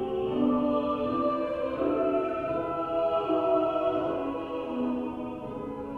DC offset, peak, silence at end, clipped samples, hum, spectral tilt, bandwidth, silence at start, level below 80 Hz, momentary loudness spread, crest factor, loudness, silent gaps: under 0.1%; -14 dBFS; 0 s; under 0.1%; none; -8 dB/octave; 5.6 kHz; 0 s; -54 dBFS; 8 LU; 14 dB; -29 LUFS; none